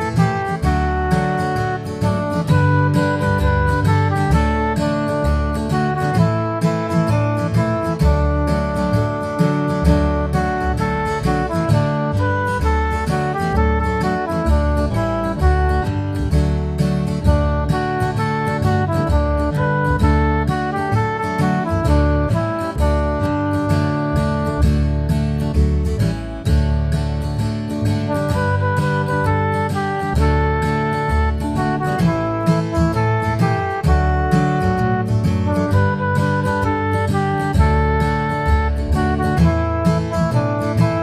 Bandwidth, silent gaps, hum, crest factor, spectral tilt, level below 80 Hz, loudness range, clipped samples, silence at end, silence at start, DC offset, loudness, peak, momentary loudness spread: 14 kHz; none; none; 16 dB; -7.5 dB/octave; -24 dBFS; 1 LU; under 0.1%; 0 s; 0 s; under 0.1%; -18 LUFS; -2 dBFS; 3 LU